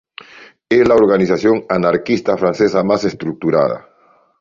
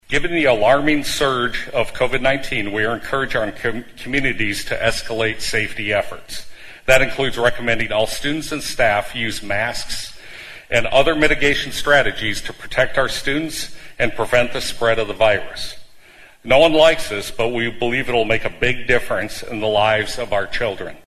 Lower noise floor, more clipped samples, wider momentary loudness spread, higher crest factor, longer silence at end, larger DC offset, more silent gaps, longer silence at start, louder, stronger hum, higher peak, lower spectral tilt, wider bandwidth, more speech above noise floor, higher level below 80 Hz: about the same, -42 dBFS vs -44 dBFS; neither; second, 9 LU vs 12 LU; about the same, 14 dB vs 18 dB; first, 0.6 s vs 0.05 s; neither; neither; first, 0.4 s vs 0.1 s; first, -15 LUFS vs -18 LUFS; neither; about the same, -2 dBFS vs 0 dBFS; first, -7 dB/octave vs -4 dB/octave; second, 7.6 kHz vs 13.5 kHz; about the same, 28 dB vs 26 dB; second, -50 dBFS vs -36 dBFS